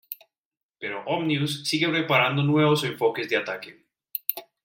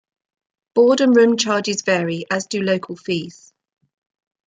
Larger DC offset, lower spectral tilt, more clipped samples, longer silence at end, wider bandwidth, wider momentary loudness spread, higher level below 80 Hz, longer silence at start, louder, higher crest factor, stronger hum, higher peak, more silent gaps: neither; about the same, -5 dB/octave vs -4.5 dB/octave; neither; second, 0.2 s vs 1.15 s; first, 16.5 kHz vs 9.4 kHz; first, 15 LU vs 11 LU; about the same, -70 dBFS vs -68 dBFS; second, 0.1 s vs 0.75 s; second, -24 LUFS vs -18 LUFS; first, 22 dB vs 16 dB; neither; about the same, -4 dBFS vs -4 dBFS; first, 0.38-0.51 s, 0.63-0.69 s vs none